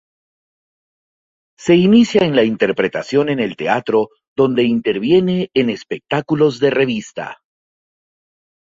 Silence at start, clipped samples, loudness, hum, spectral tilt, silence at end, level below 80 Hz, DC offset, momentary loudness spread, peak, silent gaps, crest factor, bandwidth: 1.6 s; under 0.1%; -16 LUFS; none; -6.5 dB/octave; 1.3 s; -56 dBFS; under 0.1%; 12 LU; -2 dBFS; 4.28-4.36 s; 16 dB; 7.8 kHz